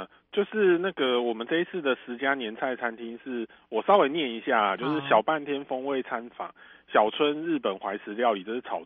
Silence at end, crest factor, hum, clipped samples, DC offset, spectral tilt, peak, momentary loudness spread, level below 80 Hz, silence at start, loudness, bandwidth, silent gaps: 0 s; 20 dB; none; under 0.1%; under 0.1%; -7.5 dB/octave; -6 dBFS; 12 LU; -74 dBFS; 0 s; -27 LUFS; 4.3 kHz; none